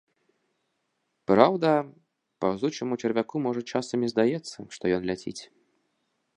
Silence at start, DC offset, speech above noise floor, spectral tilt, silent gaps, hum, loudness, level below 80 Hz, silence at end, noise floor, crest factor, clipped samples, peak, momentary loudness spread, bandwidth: 1.3 s; under 0.1%; 51 dB; -6 dB/octave; none; none; -26 LUFS; -64 dBFS; 0.9 s; -77 dBFS; 26 dB; under 0.1%; -2 dBFS; 17 LU; 10.5 kHz